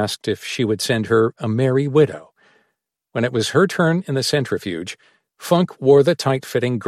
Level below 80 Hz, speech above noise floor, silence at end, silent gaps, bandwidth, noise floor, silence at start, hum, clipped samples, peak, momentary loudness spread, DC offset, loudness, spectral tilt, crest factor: -60 dBFS; 54 dB; 0 s; none; 15 kHz; -72 dBFS; 0 s; none; under 0.1%; -2 dBFS; 13 LU; under 0.1%; -19 LUFS; -5.5 dB/octave; 18 dB